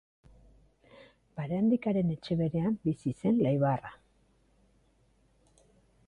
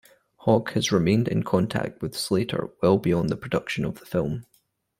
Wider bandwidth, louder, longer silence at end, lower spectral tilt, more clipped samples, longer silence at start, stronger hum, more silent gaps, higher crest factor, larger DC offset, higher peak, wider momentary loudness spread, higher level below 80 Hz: second, 10 kHz vs 16 kHz; second, -30 LUFS vs -25 LUFS; first, 2.15 s vs 0.6 s; first, -9.5 dB/octave vs -6 dB/octave; neither; first, 1.35 s vs 0.45 s; neither; neither; about the same, 16 dB vs 18 dB; neither; second, -16 dBFS vs -6 dBFS; about the same, 10 LU vs 8 LU; second, -62 dBFS vs -54 dBFS